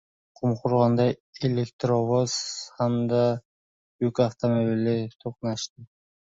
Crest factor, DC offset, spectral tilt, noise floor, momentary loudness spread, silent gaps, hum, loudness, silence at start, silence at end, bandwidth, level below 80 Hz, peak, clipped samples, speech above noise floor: 18 dB; under 0.1%; -6.5 dB/octave; under -90 dBFS; 10 LU; 1.20-1.33 s, 1.73-1.79 s, 3.45-3.99 s, 5.70-5.76 s; none; -26 LUFS; 0.4 s; 0.5 s; 8 kHz; -62 dBFS; -8 dBFS; under 0.1%; over 65 dB